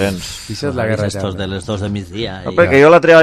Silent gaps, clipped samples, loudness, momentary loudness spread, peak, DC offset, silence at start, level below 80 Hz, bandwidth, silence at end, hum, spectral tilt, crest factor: none; under 0.1%; -14 LUFS; 15 LU; 0 dBFS; under 0.1%; 0 s; -36 dBFS; 14.5 kHz; 0 s; none; -5.5 dB/octave; 14 dB